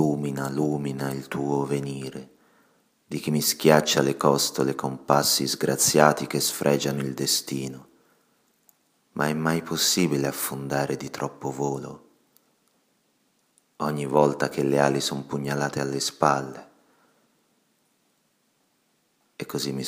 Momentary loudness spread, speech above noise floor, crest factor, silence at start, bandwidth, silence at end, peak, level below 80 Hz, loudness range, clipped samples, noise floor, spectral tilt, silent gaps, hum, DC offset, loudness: 13 LU; 45 dB; 26 dB; 0 s; 15.5 kHz; 0 s; 0 dBFS; -64 dBFS; 9 LU; under 0.1%; -69 dBFS; -4 dB/octave; none; none; under 0.1%; -24 LUFS